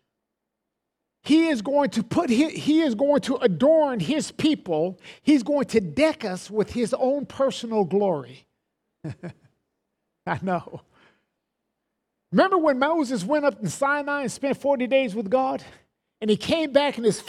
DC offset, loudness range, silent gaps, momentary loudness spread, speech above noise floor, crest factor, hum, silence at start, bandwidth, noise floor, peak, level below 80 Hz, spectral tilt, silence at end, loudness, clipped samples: under 0.1%; 10 LU; none; 11 LU; 59 dB; 18 dB; none; 1.25 s; 13 kHz; -82 dBFS; -6 dBFS; -62 dBFS; -5.5 dB/octave; 0 s; -23 LUFS; under 0.1%